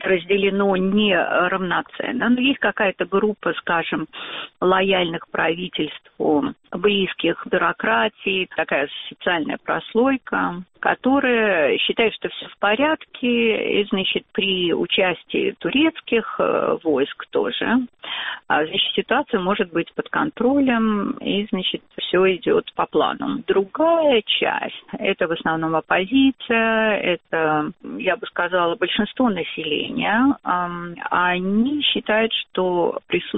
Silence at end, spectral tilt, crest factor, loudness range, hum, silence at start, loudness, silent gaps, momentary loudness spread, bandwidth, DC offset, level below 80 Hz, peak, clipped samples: 0 s; -2.5 dB/octave; 18 dB; 2 LU; none; 0 s; -20 LUFS; none; 7 LU; 4 kHz; under 0.1%; -56 dBFS; -2 dBFS; under 0.1%